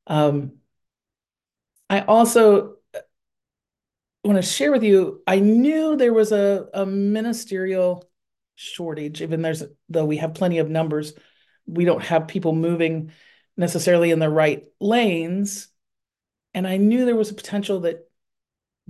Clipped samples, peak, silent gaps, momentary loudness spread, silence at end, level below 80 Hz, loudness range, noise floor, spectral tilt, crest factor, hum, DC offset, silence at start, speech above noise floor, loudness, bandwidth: under 0.1%; -4 dBFS; none; 15 LU; 0.9 s; -70 dBFS; 7 LU; under -90 dBFS; -5.5 dB/octave; 18 dB; none; under 0.1%; 0.1 s; over 70 dB; -20 LUFS; 12.5 kHz